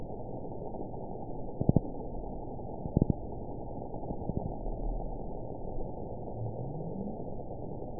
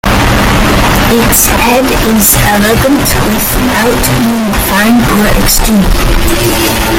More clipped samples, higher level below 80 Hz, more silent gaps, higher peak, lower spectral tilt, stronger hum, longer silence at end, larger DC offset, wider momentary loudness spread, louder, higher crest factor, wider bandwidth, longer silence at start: second, under 0.1% vs 0.3%; second, -42 dBFS vs -16 dBFS; neither; second, -10 dBFS vs 0 dBFS; first, -6 dB/octave vs -4 dB/octave; neither; about the same, 0 s vs 0 s; first, 0.7% vs under 0.1%; first, 11 LU vs 4 LU; second, -38 LUFS vs -7 LUFS; first, 26 dB vs 8 dB; second, 1 kHz vs over 20 kHz; about the same, 0 s vs 0.05 s